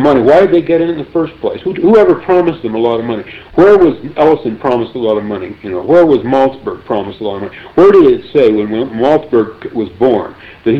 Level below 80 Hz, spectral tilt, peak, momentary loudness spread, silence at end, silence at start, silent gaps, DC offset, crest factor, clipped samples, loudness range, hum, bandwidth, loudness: -42 dBFS; -8 dB/octave; 0 dBFS; 13 LU; 0 s; 0 s; none; under 0.1%; 10 dB; under 0.1%; 2 LU; none; 6.4 kHz; -11 LUFS